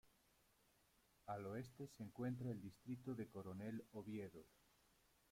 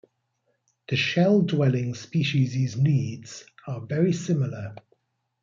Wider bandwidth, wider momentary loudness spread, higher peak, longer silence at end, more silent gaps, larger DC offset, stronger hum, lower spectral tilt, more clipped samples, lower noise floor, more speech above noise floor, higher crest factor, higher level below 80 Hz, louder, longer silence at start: first, 16.5 kHz vs 7.6 kHz; second, 8 LU vs 17 LU; second, -36 dBFS vs -10 dBFS; first, 0.85 s vs 0.65 s; neither; neither; neither; about the same, -7.5 dB/octave vs -6.5 dB/octave; neither; first, -78 dBFS vs -74 dBFS; second, 27 dB vs 50 dB; about the same, 16 dB vs 16 dB; second, -80 dBFS vs -66 dBFS; second, -52 LUFS vs -24 LUFS; second, 0.05 s vs 0.9 s